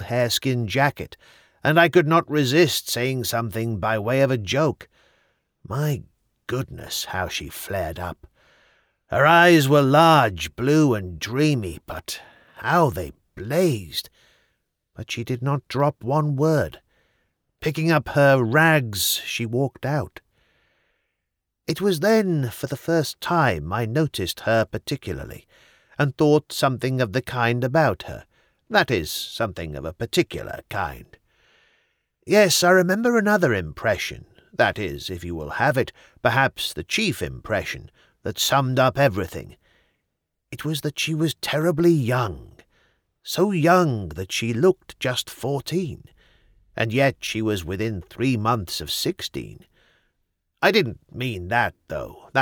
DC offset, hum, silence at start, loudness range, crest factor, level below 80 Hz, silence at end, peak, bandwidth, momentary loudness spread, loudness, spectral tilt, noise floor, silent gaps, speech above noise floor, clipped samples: under 0.1%; none; 0 s; 6 LU; 20 dB; -50 dBFS; 0 s; -4 dBFS; over 20 kHz; 15 LU; -22 LUFS; -5 dB/octave; -80 dBFS; none; 58 dB; under 0.1%